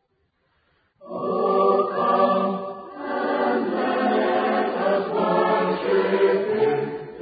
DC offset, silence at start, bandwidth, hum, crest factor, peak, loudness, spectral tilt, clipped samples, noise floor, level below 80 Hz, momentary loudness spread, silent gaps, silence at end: under 0.1%; 1.05 s; 5 kHz; none; 16 dB; -8 dBFS; -22 LUFS; -10.5 dB/octave; under 0.1%; -69 dBFS; -68 dBFS; 10 LU; none; 0 s